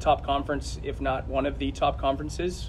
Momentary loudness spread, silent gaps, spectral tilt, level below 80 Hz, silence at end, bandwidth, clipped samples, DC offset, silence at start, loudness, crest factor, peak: 6 LU; none; -5.5 dB/octave; -36 dBFS; 0 s; 12.5 kHz; under 0.1%; under 0.1%; 0 s; -28 LUFS; 18 dB; -10 dBFS